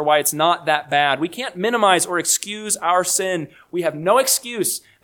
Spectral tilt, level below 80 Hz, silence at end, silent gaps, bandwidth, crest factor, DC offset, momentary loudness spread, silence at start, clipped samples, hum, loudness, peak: -2 dB/octave; -66 dBFS; 0.25 s; none; 19 kHz; 20 dB; under 0.1%; 8 LU; 0 s; under 0.1%; none; -19 LUFS; 0 dBFS